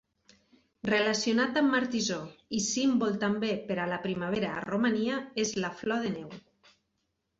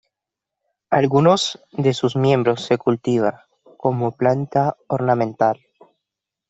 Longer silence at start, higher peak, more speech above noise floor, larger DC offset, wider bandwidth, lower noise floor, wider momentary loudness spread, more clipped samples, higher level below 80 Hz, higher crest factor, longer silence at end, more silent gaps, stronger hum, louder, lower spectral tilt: about the same, 0.85 s vs 0.9 s; second, -16 dBFS vs -2 dBFS; second, 50 dB vs 67 dB; neither; about the same, 8 kHz vs 8.2 kHz; second, -80 dBFS vs -85 dBFS; about the same, 9 LU vs 7 LU; neither; second, -66 dBFS vs -60 dBFS; about the same, 16 dB vs 18 dB; about the same, 1 s vs 0.95 s; neither; neither; second, -30 LUFS vs -19 LUFS; second, -4 dB/octave vs -6.5 dB/octave